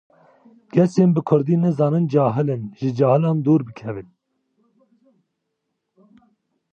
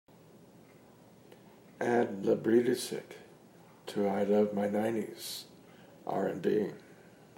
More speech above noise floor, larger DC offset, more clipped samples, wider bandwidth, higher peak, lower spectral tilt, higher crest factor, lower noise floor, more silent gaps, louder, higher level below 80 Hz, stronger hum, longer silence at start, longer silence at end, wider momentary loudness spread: first, 58 dB vs 27 dB; neither; neither; second, 8 kHz vs 16 kHz; first, -4 dBFS vs -14 dBFS; first, -9.5 dB/octave vs -5.5 dB/octave; about the same, 18 dB vs 18 dB; first, -77 dBFS vs -58 dBFS; neither; first, -19 LUFS vs -32 LUFS; first, -64 dBFS vs -80 dBFS; neither; second, 0.75 s vs 1.8 s; first, 2.7 s vs 0.45 s; second, 12 LU vs 18 LU